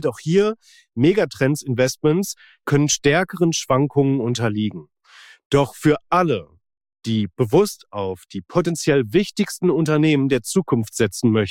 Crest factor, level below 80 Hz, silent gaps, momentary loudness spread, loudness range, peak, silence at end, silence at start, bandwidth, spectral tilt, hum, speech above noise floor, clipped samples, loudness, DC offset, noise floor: 14 dB; -52 dBFS; 5.45-5.50 s; 10 LU; 2 LU; -6 dBFS; 0 s; 0 s; 16.5 kHz; -5.5 dB/octave; none; 29 dB; under 0.1%; -20 LUFS; under 0.1%; -48 dBFS